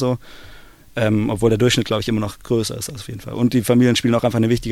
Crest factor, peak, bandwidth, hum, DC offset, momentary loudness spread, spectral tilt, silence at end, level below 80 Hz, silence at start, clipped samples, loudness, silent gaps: 16 dB; -4 dBFS; 16 kHz; none; under 0.1%; 13 LU; -5.5 dB/octave; 0 s; -42 dBFS; 0 s; under 0.1%; -19 LUFS; none